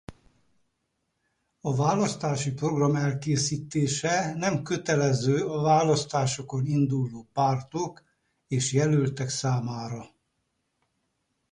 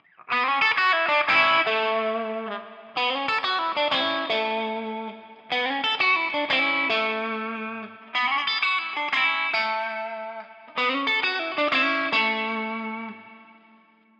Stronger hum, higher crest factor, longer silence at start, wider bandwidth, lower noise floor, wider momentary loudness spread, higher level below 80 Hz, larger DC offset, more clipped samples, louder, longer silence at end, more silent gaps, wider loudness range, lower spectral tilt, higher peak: neither; about the same, 16 dB vs 18 dB; second, 0.1 s vs 0.3 s; first, 11 kHz vs 8.4 kHz; first, -78 dBFS vs -57 dBFS; second, 9 LU vs 13 LU; first, -60 dBFS vs -78 dBFS; neither; neither; second, -26 LUFS vs -23 LUFS; first, 1.45 s vs 0.7 s; neither; about the same, 4 LU vs 3 LU; first, -5.5 dB/octave vs -3.5 dB/octave; about the same, -10 dBFS vs -8 dBFS